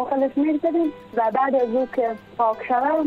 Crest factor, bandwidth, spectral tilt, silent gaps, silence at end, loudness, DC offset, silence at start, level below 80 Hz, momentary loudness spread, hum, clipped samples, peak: 12 dB; 5.2 kHz; -7.5 dB/octave; none; 0 s; -22 LUFS; under 0.1%; 0 s; -62 dBFS; 4 LU; none; under 0.1%; -10 dBFS